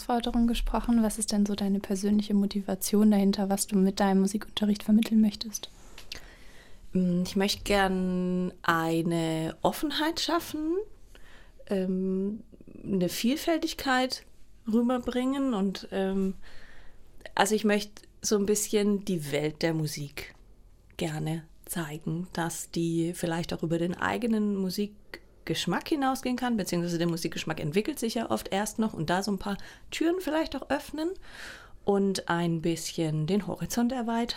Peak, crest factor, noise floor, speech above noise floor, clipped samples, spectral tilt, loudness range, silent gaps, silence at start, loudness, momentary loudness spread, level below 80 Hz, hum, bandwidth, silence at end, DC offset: -6 dBFS; 22 dB; -54 dBFS; 26 dB; under 0.1%; -5 dB/octave; 5 LU; none; 0 s; -29 LUFS; 10 LU; -48 dBFS; none; 16.5 kHz; 0 s; under 0.1%